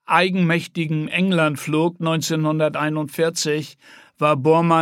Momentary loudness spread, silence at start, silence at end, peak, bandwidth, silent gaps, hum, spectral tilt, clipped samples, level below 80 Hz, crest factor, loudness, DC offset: 7 LU; 0.1 s; 0 s; -2 dBFS; 16 kHz; none; none; -5.5 dB/octave; under 0.1%; -70 dBFS; 18 dB; -20 LUFS; under 0.1%